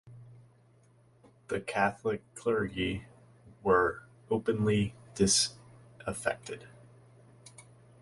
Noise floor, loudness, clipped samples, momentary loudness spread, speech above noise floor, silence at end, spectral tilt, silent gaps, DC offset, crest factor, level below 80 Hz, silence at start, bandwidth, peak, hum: -63 dBFS; -31 LUFS; under 0.1%; 16 LU; 33 dB; 0.4 s; -4 dB/octave; none; under 0.1%; 22 dB; -58 dBFS; 0.05 s; 11.5 kHz; -12 dBFS; none